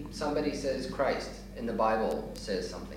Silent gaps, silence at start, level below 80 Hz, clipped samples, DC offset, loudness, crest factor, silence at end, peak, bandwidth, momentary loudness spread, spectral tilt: none; 0 s; -48 dBFS; under 0.1%; under 0.1%; -32 LUFS; 18 dB; 0 s; -16 dBFS; 16 kHz; 8 LU; -5 dB/octave